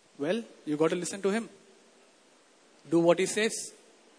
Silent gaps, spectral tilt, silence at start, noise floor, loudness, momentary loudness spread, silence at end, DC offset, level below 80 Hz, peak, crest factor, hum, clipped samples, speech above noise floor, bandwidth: none; -4.5 dB/octave; 0.2 s; -61 dBFS; -29 LUFS; 12 LU; 0.5 s; under 0.1%; -82 dBFS; -10 dBFS; 22 dB; none; under 0.1%; 33 dB; 11 kHz